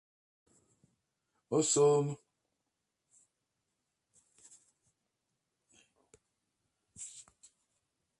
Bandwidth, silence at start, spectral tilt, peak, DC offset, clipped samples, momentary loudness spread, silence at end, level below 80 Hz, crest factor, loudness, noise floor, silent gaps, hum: 11.5 kHz; 1.5 s; -4.5 dB/octave; -18 dBFS; under 0.1%; under 0.1%; 21 LU; 1 s; -82 dBFS; 22 dB; -30 LUFS; -86 dBFS; none; none